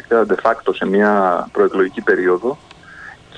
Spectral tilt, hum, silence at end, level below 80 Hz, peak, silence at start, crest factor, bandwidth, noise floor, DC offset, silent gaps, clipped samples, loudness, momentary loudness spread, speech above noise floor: -7 dB/octave; none; 0 s; -56 dBFS; -2 dBFS; 0.1 s; 14 dB; 9.4 kHz; -38 dBFS; under 0.1%; none; under 0.1%; -16 LUFS; 19 LU; 22 dB